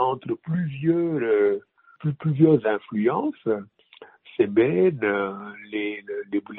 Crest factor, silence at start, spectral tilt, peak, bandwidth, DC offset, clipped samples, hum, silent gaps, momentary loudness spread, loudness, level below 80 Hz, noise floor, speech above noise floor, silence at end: 18 dB; 0 s; -7 dB/octave; -6 dBFS; 4 kHz; under 0.1%; under 0.1%; none; none; 12 LU; -24 LUFS; -66 dBFS; -50 dBFS; 27 dB; 0 s